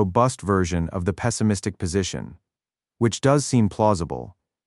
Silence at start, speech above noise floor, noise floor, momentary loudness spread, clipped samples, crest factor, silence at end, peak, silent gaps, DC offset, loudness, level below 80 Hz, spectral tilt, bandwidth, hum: 0 s; over 68 dB; under -90 dBFS; 12 LU; under 0.1%; 18 dB; 0.35 s; -4 dBFS; none; under 0.1%; -23 LUFS; -44 dBFS; -6 dB/octave; 11.5 kHz; none